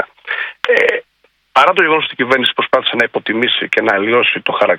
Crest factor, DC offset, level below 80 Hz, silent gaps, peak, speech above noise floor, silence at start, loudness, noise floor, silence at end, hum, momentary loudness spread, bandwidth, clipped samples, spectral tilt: 14 dB; under 0.1%; -60 dBFS; none; 0 dBFS; 44 dB; 0 s; -13 LUFS; -58 dBFS; 0 s; none; 7 LU; 12 kHz; 0.2%; -4 dB/octave